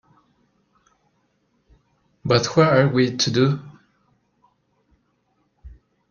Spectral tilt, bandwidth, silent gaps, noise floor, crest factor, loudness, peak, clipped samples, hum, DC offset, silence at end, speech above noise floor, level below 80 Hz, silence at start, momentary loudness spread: -5.5 dB/octave; 7.2 kHz; none; -68 dBFS; 22 dB; -19 LUFS; -2 dBFS; under 0.1%; none; under 0.1%; 0.4 s; 50 dB; -54 dBFS; 2.25 s; 9 LU